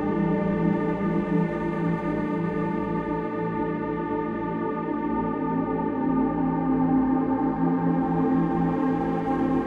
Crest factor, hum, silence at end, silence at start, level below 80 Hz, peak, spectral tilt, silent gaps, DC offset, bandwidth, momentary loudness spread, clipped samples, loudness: 14 dB; none; 0 s; 0 s; -46 dBFS; -12 dBFS; -10 dB/octave; none; under 0.1%; 4.9 kHz; 5 LU; under 0.1%; -25 LUFS